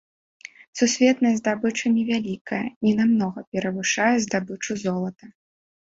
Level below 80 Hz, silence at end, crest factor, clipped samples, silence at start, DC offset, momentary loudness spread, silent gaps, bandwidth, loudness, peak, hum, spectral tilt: -64 dBFS; 0.6 s; 18 dB; under 0.1%; 0.75 s; under 0.1%; 10 LU; 2.41-2.45 s, 2.76-2.81 s, 3.47-3.52 s; 7.8 kHz; -23 LUFS; -6 dBFS; none; -4.5 dB/octave